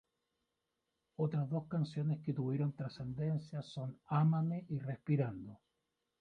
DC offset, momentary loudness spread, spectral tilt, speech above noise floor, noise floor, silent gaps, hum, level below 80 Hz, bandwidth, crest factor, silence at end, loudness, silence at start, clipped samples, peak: under 0.1%; 12 LU; -9.5 dB/octave; 50 dB; -87 dBFS; none; none; -72 dBFS; 6.4 kHz; 16 dB; 0.65 s; -38 LUFS; 1.2 s; under 0.1%; -22 dBFS